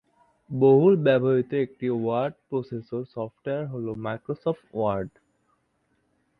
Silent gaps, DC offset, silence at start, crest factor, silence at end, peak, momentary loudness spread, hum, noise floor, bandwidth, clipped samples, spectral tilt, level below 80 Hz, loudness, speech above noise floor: none; under 0.1%; 0.5 s; 18 dB; 1.3 s; -8 dBFS; 15 LU; none; -71 dBFS; 5 kHz; under 0.1%; -10.5 dB/octave; -62 dBFS; -25 LUFS; 47 dB